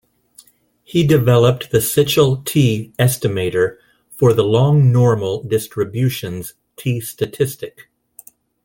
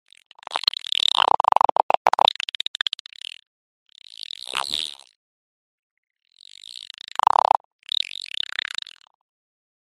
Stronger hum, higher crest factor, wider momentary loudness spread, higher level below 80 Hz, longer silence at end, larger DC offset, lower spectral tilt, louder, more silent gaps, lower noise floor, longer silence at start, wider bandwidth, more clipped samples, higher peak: neither; second, 16 dB vs 24 dB; second, 12 LU vs 19 LU; first, -50 dBFS vs -68 dBFS; second, 0.95 s vs 5 s; neither; first, -6 dB/octave vs 0 dB/octave; first, -16 LUFS vs -22 LUFS; second, none vs 1.72-1.76 s, 1.83-1.89 s, 1.97-2.05 s, 2.67-2.74 s, 3.00-3.05 s, 3.47-3.86 s; first, -53 dBFS vs -45 dBFS; first, 0.95 s vs 0.5 s; first, 17 kHz vs 13 kHz; neither; about the same, 0 dBFS vs 0 dBFS